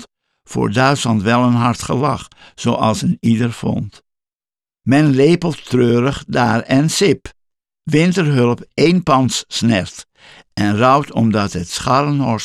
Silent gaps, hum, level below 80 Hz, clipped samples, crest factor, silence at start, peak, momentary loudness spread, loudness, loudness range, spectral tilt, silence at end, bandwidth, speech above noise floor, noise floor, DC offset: 4.35-4.39 s; none; -46 dBFS; under 0.1%; 14 dB; 0 s; -2 dBFS; 9 LU; -15 LUFS; 2 LU; -5.5 dB/octave; 0 s; 13.5 kHz; over 75 dB; under -90 dBFS; under 0.1%